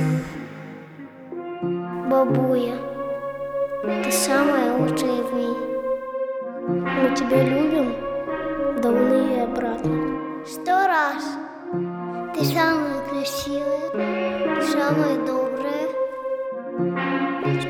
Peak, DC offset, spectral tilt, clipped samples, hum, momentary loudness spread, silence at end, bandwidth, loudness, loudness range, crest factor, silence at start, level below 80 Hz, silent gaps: -6 dBFS; under 0.1%; -5.5 dB/octave; under 0.1%; none; 11 LU; 0 s; 20 kHz; -23 LUFS; 3 LU; 18 dB; 0 s; -52 dBFS; none